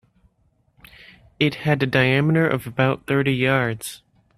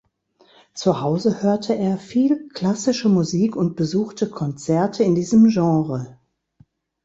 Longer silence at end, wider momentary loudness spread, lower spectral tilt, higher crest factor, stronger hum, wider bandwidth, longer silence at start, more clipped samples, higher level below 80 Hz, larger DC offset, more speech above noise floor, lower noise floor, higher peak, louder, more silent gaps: second, 0.4 s vs 0.9 s; second, 6 LU vs 10 LU; about the same, -6 dB/octave vs -7 dB/octave; about the same, 20 dB vs 16 dB; neither; first, 14.5 kHz vs 8 kHz; first, 1.4 s vs 0.75 s; neither; about the same, -54 dBFS vs -58 dBFS; neither; first, 44 dB vs 39 dB; first, -64 dBFS vs -58 dBFS; about the same, -2 dBFS vs -4 dBFS; about the same, -20 LUFS vs -20 LUFS; neither